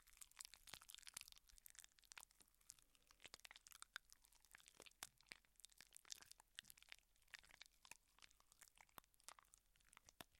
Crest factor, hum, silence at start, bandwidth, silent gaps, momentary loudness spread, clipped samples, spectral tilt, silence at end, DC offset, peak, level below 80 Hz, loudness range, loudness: 38 dB; none; 0 s; 16.5 kHz; none; 8 LU; under 0.1%; 0.5 dB/octave; 0 s; under 0.1%; -28 dBFS; -84 dBFS; 4 LU; -63 LUFS